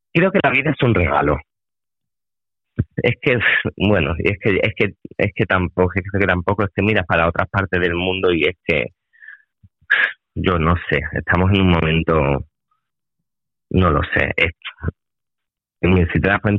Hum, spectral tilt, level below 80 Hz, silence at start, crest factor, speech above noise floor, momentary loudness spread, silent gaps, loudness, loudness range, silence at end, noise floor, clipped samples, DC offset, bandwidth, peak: none; -9 dB/octave; -36 dBFS; 0.15 s; 18 dB; over 73 dB; 7 LU; none; -18 LUFS; 2 LU; 0 s; under -90 dBFS; under 0.1%; under 0.1%; 5.4 kHz; -2 dBFS